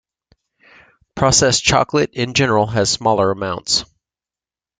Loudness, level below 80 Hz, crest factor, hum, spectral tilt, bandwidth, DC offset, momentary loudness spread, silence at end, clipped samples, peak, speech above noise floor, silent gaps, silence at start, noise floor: -16 LUFS; -44 dBFS; 18 dB; none; -3 dB/octave; 10 kHz; under 0.1%; 6 LU; 0.95 s; under 0.1%; 0 dBFS; over 74 dB; none; 1.15 s; under -90 dBFS